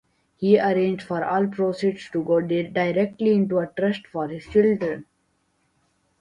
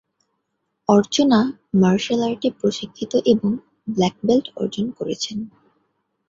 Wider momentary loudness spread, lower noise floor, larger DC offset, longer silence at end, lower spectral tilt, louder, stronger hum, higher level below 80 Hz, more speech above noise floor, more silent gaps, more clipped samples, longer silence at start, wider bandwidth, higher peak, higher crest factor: about the same, 9 LU vs 11 LU; second, -69 dBFS vs -75 dBFS; neither; first, 1.2 s vs 0.8 s; first, -8 dB/octave vs -6 dB/octave; second, -23 LUFS vs -20 LUFS; neither; about the same, -60 dBFS vs -58 dBFS; second, 47 dB vs 55 dB; neither; neither; second, 0.4 s vs 0.9 s; first, 10 kHz vs 7.6 kHz; about the same, -4 dBFS vs -2 dBFS; about the same, 18 dB vs 18 dB